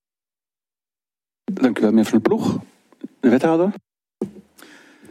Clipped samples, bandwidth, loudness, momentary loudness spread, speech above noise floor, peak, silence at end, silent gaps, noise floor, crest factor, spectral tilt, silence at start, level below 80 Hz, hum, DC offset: under 0.1%; 14.5 kHz; -19 LUFS; 20 LU; over 73 dB; -2 dBFS; 0.7 s; none; under -90 dBFS; 20 dB; -7 dB/octave; 1.5 s; -68 dBFS; none; under 0.1%